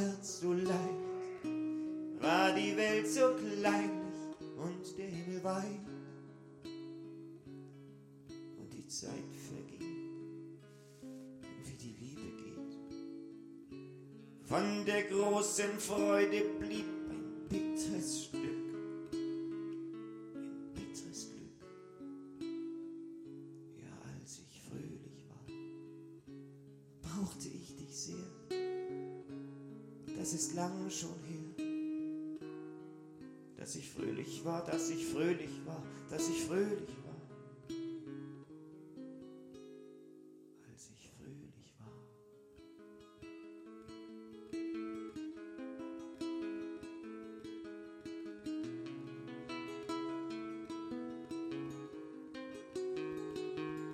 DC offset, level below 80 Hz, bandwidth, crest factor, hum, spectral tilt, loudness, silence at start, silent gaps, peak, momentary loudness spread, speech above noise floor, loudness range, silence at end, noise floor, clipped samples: under 0.1%; -72 dBFS; 16 kHz; 24 dB; none; -4.5 dB/octave; -40 LUFS; 0 s; none; -18 dBFS; 20 LU; 25 dB; 16 LU; 0 s; -61 dBFS; under 0.1%